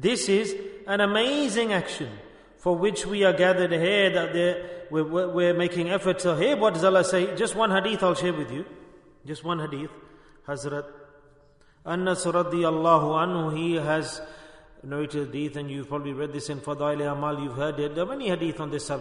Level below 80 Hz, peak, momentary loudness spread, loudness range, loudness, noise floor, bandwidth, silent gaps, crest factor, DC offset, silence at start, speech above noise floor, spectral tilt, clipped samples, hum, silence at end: -58 dBFS; -6 dBFS; 14 LU; 8 LU; -25 LUFS; -57 dBFS; 11 kHz; none; 20 dB; under 0.1%; 0 s; 32 dB; -5 dB/octave; under 0.1%; none; 0 s